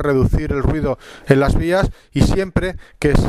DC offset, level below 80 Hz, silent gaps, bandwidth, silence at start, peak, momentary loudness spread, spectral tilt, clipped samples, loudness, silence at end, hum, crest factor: under 0.1%; -24 dBFS; none; 14 kHz; 0 s; 0 dBFS; 7 LU; -7 dB/octave; under 0.1%; -18 LUFS; 0 s; none; 16 dB